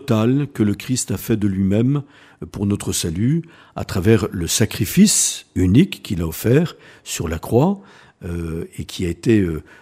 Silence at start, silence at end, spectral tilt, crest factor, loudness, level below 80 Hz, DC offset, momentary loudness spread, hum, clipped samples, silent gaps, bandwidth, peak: 0 s; 0.2 s; -5 dB/octave; 18 dB; -19 LUFS; -42 dBFS; under 0.1%; 14 LU; none; under 0.1%; none; 15.5 kHz; 0 dBFS